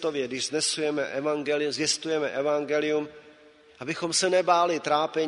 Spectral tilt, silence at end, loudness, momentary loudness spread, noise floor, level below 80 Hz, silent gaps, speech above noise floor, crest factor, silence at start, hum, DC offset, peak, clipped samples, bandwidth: -2.5 dB/octave; 0 s; -26 LUFS; 7 LU; -54 dBFS; -72 dBFS; none; 28 dB; 20 dB; 0 s; none; under 0.1%; -8 dBFS; under 0.1%; 10.5 kHz